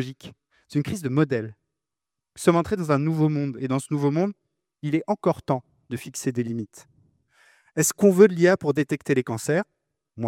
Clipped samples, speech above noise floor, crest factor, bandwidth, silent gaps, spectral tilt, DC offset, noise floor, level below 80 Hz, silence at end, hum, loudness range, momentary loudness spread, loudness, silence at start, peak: under 0.1%; 65 dB; 22 dB; 17 kHz; none; -6 dB/octave; under 0.1%; -88 dBFS; -64 dBFS; 0 s; none; 6 LU; 15 LU; -23 LUFS; 0 s; -4 dBFS